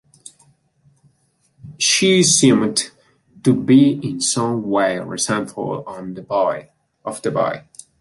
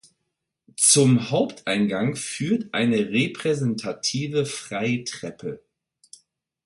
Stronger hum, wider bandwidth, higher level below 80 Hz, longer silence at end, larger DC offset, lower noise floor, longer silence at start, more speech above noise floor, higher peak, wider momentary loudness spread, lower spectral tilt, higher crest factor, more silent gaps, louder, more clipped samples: neither; about the same, 11.5 kHz vs 12 kHz; about the same, -60 dBFS vs -64 dBFS; second, 0.4 s vs 1.1 s; neither; second, -63 dBFS vs -79 dBFS; first, 1.65 s vs 0.8 s; second, 46 dB vs 56 dB; about the same, -2 dBFS vs -4 dBFS; about the same, 18 LU vs 16 LU; about the same, -4 dB/octave vs -4 dB/octave; about the same, 18 dB vs 20 dB; neither; first, -17 LUFS vs -22 LUFS; neither